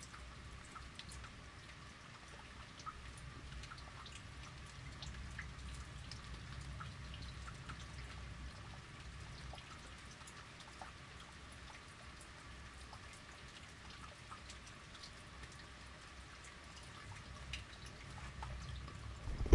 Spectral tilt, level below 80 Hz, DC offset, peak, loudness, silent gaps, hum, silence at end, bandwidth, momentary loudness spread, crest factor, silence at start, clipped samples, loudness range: -4 dB/octave; -56 dBFS; under 0.1%; -14 dBFS; -52 LUFS; none; none; 0 s; 11.5 kHz; 5 LU; 32 dB; 0 s; under 0.1%; 3 LU